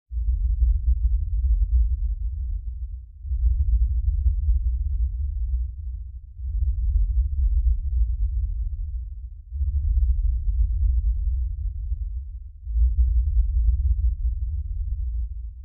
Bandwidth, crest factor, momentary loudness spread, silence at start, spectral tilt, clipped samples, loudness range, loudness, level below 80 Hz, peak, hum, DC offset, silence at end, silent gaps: 0.2 kHz; 14 dB; 11 LU; 0.1 s; -24.5 dB/octave; under 0.1%; 1 LU; -26 LUFS; -22 dBFS; -10 dBFS; none; under 0.1%; 0 s; none